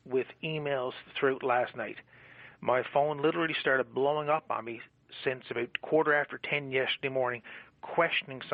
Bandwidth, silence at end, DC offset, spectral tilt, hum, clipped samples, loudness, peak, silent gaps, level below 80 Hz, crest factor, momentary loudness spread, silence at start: 5 kHz; 0 s; under 0.1%; -2.5 dB/octave; none; under 0.1%; -31 LUFS; -14 dBFS; none; -74 dBFS; 18 dB; 13 LU; 0.05 s